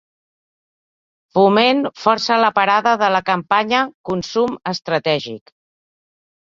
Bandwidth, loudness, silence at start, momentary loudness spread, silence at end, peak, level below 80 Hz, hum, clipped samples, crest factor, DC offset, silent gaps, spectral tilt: 7.6 kHz; -17 LUFS; 1.35 s; 8 LU; 1.2 s; 0 dBFS; -60 dBFS; none; under 0.1%; 18 dB; under 0.1%; 3.94-4.04 s; -5 dB/octave